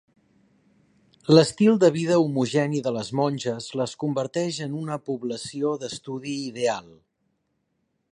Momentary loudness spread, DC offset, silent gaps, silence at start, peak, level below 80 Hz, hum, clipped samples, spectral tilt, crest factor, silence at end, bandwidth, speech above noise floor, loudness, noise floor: 13 LU; under 0.1%; none; 1.3 s; -2 dBFS; -68 dBFS; none; under 0.1%; -6 dB/octave; 22 dB; 1.3 s; 11 kHz; 51 dB; -24 LUFS; -74 dBFS